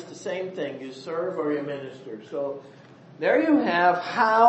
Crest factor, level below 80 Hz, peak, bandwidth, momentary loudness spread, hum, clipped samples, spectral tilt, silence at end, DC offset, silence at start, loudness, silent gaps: 18 dB; -76 dBFS; -6 dBFS; 8.4 kHz; 16 LU; none; under 0.1%; -5.5 dB/octave; 0 s; under 0.1%; 0 s; -25 LUFS; none